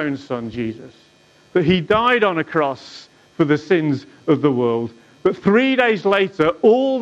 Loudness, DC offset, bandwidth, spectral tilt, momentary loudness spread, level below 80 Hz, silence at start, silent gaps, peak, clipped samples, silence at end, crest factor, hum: -18 LUFS; under 0.1%; 8 kHz; -7 dB/octave; 12 LU; -52 dBFS; 0 s; none; -4 dBFS; under 0.1%; 0 s; 14 dB; none